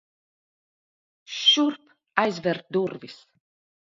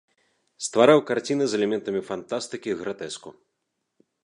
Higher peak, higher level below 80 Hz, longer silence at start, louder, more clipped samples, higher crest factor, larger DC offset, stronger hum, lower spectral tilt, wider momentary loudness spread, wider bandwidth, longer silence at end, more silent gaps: about the same, -2 dBFS vs -2 dBFS; second, -76 dBFS vs -70 dBFS; first, 1.3 s vs 0.6 s; about the same, -23 LUFS vs -24 LUFS; neither; about the same, 26 dB vs 22 dB; neither; neither; about the same, -3.5 dB/octave vs -4.5 dB/octave; first, 22 LU vs 16 LU; second, 7.6 kHz vs 11 kHz; second, 0.65 s vs 0.9 s; neither